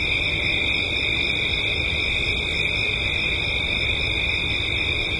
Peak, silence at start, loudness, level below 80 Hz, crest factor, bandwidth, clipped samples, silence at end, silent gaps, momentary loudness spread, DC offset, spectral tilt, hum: -10 dBFS; 0 s; -21 LUFS; -36 dBFS; 14 dB; 11.5 kHz; under 0.1%; 0 s; none; 1 LU; under 0.1%; -3.5 dB/octave; none